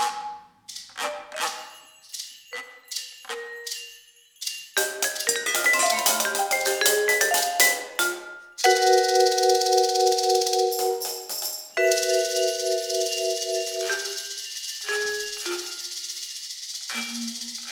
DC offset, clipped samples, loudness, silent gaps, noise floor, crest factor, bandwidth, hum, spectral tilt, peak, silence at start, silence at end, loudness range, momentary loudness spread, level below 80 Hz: under 0.1%; under 0.1%; -23 LUFS; none; -52 dBFS; 24 dB; over 20 kHz; none; 1 dB/octave; -2 dBFS; 0 s; 0 s; 13 LU; 16 LU; -72 dBFS